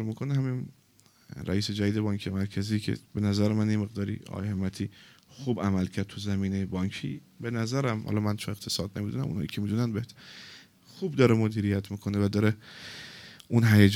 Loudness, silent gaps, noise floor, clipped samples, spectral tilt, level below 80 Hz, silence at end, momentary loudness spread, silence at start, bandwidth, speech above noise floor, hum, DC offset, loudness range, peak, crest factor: -29 LUFS; none; -61 dBFS; under 0.1%; -6.5 dB/octave; -62 dBFS; 0 s; 15 LU; 0 s; 16.5 kHz; 34 dB; none; under 0.1%; 4 LU; -4 dBFS; 24 dB